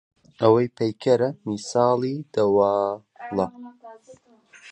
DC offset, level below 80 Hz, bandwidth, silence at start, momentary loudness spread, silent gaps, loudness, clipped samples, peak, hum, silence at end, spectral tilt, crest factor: under 0.1%; -62 dBFS; 9.4 kHz; 0.4 s; 11 LU; none; -23 LUFS; under 0.1%; -4 dBFS; none; 0 s; -6.5 dB/octave; 20 dB